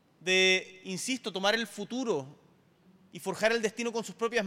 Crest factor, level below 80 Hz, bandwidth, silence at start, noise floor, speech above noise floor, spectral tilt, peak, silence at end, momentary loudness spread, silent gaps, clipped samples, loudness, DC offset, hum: 20 dB; -74 dBFS; 16.5 kHz; 0.2 s; -63 dBFS; 32 dB; -2.5 dB/octave; -12 dBFS; 0 s; 15 LU; none; under 0.1%; -30 LUFS; under 0.1%; none